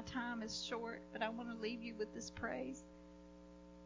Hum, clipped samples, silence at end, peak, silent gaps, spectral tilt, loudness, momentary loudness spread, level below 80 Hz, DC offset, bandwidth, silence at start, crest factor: 60 Hz at -60 dBFS; under 0.1%; 0 s; -24 dBFS; none; -4 dB/octave; -45 LUFS; 16 LU; -66 dBFS; under 0.1%; 7.6 kHz; 0 s; 22 dB